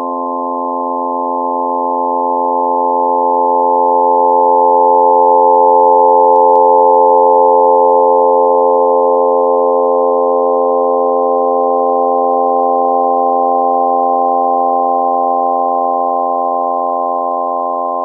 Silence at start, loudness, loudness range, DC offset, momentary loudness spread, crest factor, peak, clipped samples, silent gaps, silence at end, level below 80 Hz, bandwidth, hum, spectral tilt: 0 s; -11 LUFS; 5 LU; under 0.1%; 8 LU; 10 dB; 0 dBFS; under 0.1%; none; 0 s; -90 dBFS; 1.2 kHz; none; -11 dB/octave